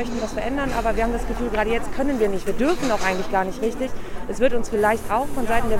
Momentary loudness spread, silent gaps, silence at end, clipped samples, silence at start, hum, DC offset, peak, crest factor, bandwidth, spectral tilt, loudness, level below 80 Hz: 5 LU; none; 0 s; under 0.1%; 0 s; none; under 0.1%; -4 dBFS; 16 dB; 16 kHz; -5 dB/octave; -23 LUFS; -32 dBFS